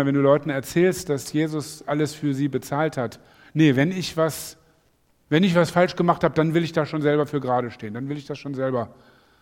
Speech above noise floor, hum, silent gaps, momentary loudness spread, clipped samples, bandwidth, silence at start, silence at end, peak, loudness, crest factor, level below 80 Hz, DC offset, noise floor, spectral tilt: 41 dB; none; none; 12 LU; under 0.1%; 17 kHz; 0 s; 0.5 s; -4 dBFS; -23 LUFS; 20 dB; -58 dBFS; under 0.1%; -63 dBFS; -6 dB/octave